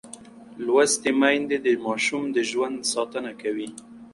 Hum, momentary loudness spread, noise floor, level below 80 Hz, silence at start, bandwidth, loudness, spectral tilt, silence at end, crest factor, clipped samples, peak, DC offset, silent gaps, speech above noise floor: none; 15 LU; -44 dBFS; -68 dBFS; 0.05 s; 11.5 kHz; -24 LUFS; -2.5 dB/octave; 0.05 s; 18 dB; under 0.1%; -6 dBFS; under 0.1%; none; 21 dB